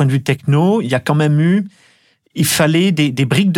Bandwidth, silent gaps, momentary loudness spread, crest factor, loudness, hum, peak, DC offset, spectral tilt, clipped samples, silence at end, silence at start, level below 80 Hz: 16.5 kHz; none; 6 LU; 12 dB; -14 LUFS; none; -2 dBFS; under 0.1%; -5.5 dB/octave; under 0.1%; 0 s; 0 s; -56 dBFS